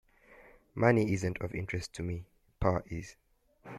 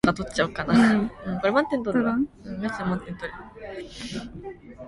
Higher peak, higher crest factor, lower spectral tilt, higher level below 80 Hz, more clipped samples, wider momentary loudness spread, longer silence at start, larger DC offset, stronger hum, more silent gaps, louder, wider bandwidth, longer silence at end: second, -12 dBFS vs -6 dBFS; about the same, 22 dB vs 20 dB; about the same, -7 dB/octave vs -6 dB/octave; about the same, -52 dBFS vs -48 dBFS; neither; about the same, 16 LU vs 18 LU; first, 0.3 s vs 0.05 s; neither; neither; neither; second, -33 LUFS vs -25 LUFS; first, 13.5 kHz vs 11.5 kHz; about the same, 0 s vs 0 s